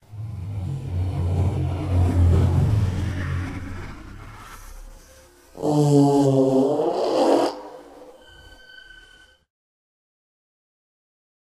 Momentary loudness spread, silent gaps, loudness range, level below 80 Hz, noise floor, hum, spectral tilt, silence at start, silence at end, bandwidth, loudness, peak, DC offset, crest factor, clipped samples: 23 LU; none; 7 LU; -38 dBFS; -52 dBFS; none; -8 dB/octave; 0.1 s; 3.3 s; 12.5 kHz; -21 LUFS; -4 dBFS; under 0.1%; 18 dB; under 0.1%